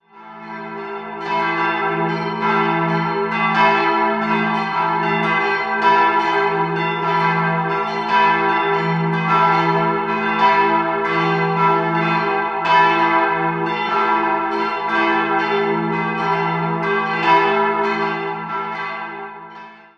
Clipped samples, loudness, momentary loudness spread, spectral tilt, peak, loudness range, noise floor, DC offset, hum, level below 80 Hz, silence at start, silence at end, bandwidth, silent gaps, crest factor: under 0.1%; -17 LUFS; 10 LU; -6.5 dB/octave; -2 dBFS; 2 LU; -39 dBFS; under 0.1%; none; -60 dBFS; 0.15 s; 0.2 s; 7.4 kHz; none; 16 dB